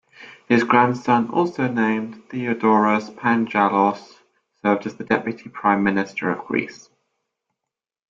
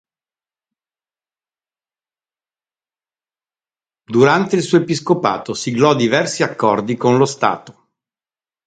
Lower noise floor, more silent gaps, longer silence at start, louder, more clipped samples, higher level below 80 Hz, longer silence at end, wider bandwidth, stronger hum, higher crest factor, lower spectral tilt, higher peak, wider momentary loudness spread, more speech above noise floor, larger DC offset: second, -85 dBFS vs under -90 dBFS; neither; second, 0.2 s vs 4.1 s; second, -20 LUFS vs -16 LUFS; neither; about the same, -64 dBFS vs -62 dBFS; first, 1.35 s vs 0.95 s; second, 7.4 kHz vs 9.4 kHz; neither; about the same, 20 dB vs 18 dB; first, -7 dB/octave vs -5.5 dB/octave; about the same, -2 dBFS vs 0 dBFS; about the same, 9 LU vs 7 LU; second, 65 dB vs over 75 dB; neither